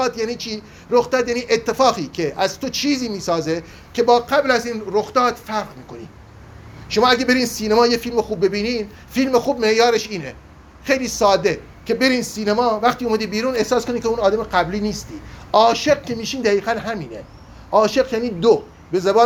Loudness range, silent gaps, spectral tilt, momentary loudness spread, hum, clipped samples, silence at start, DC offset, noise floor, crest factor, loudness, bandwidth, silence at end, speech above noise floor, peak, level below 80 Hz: 2 LU; none; -4 dB/octave; 12 LU; none; under 0.1%; 0 s; under 0.1%; -40 dBFS; 18 dB; -19 LUFS; 19 kHz; 0 s; 22 dB; -2 dBFS; -46 dBFS